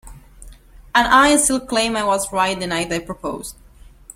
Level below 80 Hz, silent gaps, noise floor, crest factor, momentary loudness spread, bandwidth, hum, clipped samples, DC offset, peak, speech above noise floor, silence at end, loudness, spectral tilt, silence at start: -42 dBFS; none; -43 dBFS; 18 dB; 16 LU; 16.5 kHz; none; under 0.1%; under 0.1%; -2 dBFS; 25 dB; 0.65 s; -17 LUFS; -2.5 dB/octave; 0.05 s